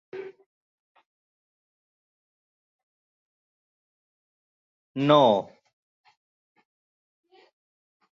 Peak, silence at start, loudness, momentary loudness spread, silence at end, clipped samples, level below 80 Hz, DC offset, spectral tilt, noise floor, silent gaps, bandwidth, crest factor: -6 dBFS; 0.15 s; -21 LUFS; 25 LU; 2.75 s; under 0.1%; -78 dBFS; under 0.1%; -7 dB/octave; under -90 dBFS; 0.46-0.95 s, 1.06-4.95 s; 7.2 kHz; 26 dB